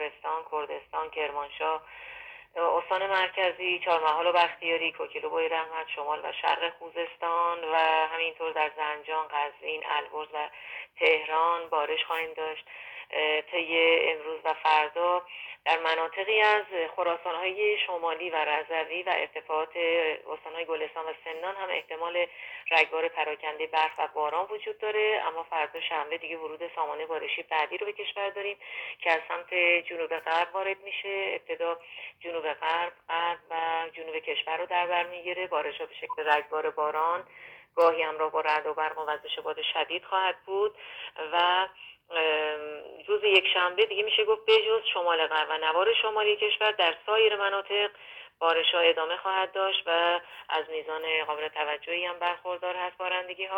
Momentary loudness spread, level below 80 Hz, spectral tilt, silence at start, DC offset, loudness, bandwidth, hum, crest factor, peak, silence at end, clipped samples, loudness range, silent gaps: 11 LU; -76 dBFS; -3 dB/octave; 0 s; under 0.1%; -28 LUFS; 17 kHz; none; 22 dB; -6 dBFS; 0 s; under 0.1%; 6 LU; none